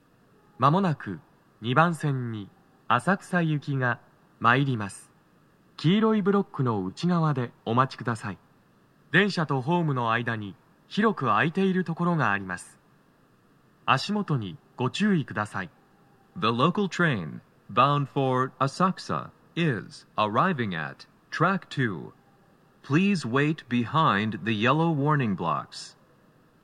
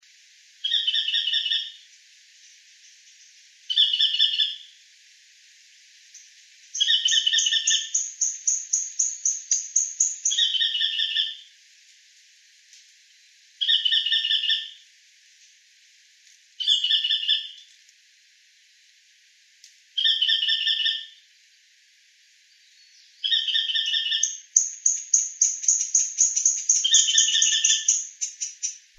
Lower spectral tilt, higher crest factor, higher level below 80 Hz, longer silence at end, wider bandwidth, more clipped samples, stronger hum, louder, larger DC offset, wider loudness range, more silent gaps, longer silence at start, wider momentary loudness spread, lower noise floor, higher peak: first, -6.5 dB/octave vs 14 dB/octave; about the same, 22 dB vs 26 dB; first, -72 dBFS vs under -90 dBFS; first, 0.75 s vs 0.2 s; second, 11.5 kHz vs 14 kHz; neither; neither; second, -26 LUFS vs -21 LUFS; neither; second, 3 LU vs 7 LU; neither; about the same, 0.6 s vs 0.65 s; first, 14 LU vs 10 LU; about the same, -61 dBFS vs -58 dBFS; second, -4 dBFS vs 0 dBFS